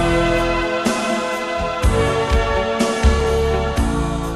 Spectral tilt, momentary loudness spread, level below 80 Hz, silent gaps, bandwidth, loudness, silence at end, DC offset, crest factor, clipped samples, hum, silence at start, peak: -5.5 dB/octave; 4 LU; -22 dBFS; none; 13 kHz; -18 LUFS; 0 s; under 0.1%; 16 dB; under 0.1%; none; 0 s; -2 dBFS